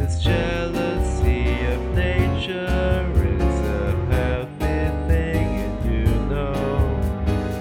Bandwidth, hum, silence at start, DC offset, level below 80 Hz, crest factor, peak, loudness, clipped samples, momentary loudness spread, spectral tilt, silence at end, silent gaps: 14.5 kHz; none; 0 s; under 0.1%; -24 dBFS; 14 dB; -6 dBFS; -22 LUFS; under 0.1%; 3 LU; -7 dB/octave; 0 s; none